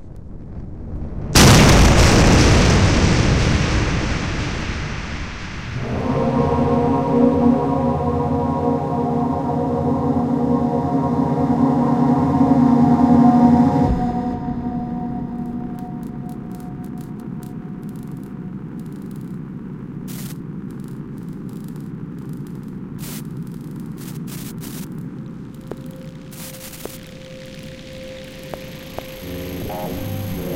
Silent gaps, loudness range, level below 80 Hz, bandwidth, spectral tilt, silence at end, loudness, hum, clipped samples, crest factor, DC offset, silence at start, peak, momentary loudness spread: none; 18 LU; -28 dBFS; 16.5 kHz; -5.5 dB/octave; 0 s; -17 LUFS; none; under 0.1%; 16 dB; under 0.1%; 0 s; -2 dBFS; 20 LU